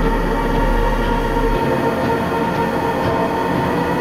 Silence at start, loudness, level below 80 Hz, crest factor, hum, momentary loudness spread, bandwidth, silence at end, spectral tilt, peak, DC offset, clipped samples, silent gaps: 0 s; -18 LUFS; -24 dBFS; 14 dB; none; 1 LU; 16 kHz; 0 s; -6.5 dB/octave; -4 dBFS; under 0.1%; under 0.1%; none